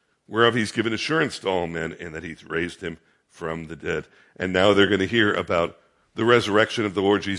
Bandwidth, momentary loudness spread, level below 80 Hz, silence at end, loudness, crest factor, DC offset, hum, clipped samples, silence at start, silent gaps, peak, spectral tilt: 11.5 kHz; 15 LU; -58 dBFS; 0 s; -23 LUFS; 20 dB; under 0.1%; none; under 0.1%; 0.3 s; none; -2 dBFS; -5 dB/octave